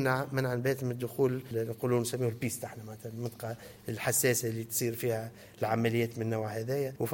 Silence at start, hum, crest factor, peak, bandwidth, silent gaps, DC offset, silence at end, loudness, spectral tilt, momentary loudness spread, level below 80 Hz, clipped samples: 0 s; none; 18 dB; -14 dBFS; 17 kHz; none; under 0.1%; 0 s; -32 LUFS; -5 dB/octave; 12 LU; -68 dBFS; under 0.1%